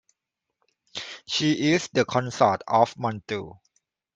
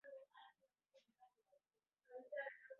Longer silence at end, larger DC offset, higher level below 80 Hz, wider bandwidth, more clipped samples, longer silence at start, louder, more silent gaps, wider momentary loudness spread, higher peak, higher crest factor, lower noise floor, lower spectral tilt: first, 0.65 s vs 0 s; neither; first, -66 dBFS vs under -90 dBFS; first, 8.2 kHz vs 4.3 kHz; neither; first, 0.95 s vs 0.05 s; first, -24 LUFS vs -54 LUFS; neither; second, 14 LU vs 17 LU; first, -4 dBFS vs -36 dBFS; about the same, 22 dB vs 22 dB; second, -84 dBFS vs under -90 dBFS; first, -4.5 dB/octave vs 1.5 dB/octave